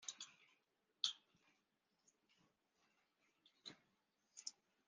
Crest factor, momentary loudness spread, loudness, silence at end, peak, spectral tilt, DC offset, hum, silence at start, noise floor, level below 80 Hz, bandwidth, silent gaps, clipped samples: 34 dB; 18 LU; -49 LUFS; 0.35 s; -22 dBFS; 1.5 dB/octave; under 0.1%; none; 0 s; -86 dBFS; under -90 dBFS; 9.6 kHz; none; under 0.1%